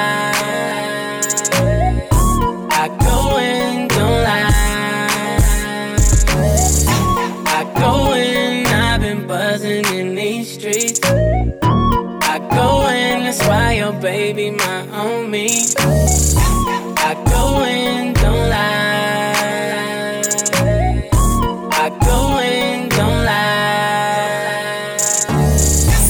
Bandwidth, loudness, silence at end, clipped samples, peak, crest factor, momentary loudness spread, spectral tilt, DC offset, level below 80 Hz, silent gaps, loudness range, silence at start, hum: over 20 kHz; -15 LUFS; 0 s; under 0.1%; 0 dBFS; 14 dB; 6 LU; -4 dB/octave; under 0.1%; -22 dBFS; none; 2 LU; 0 s; none